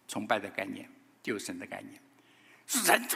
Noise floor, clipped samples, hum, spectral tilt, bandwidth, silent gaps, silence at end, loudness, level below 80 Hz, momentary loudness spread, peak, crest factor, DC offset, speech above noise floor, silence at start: -61 dBFS; under 0.1%; none; -1.5 dB/octave; 16 kHz; none; 0 s; -32 LUFS; -84 dBFS; 24 LU; -6 dBFS; 28 dB; under 0.1%; 28 dB; 0.1 s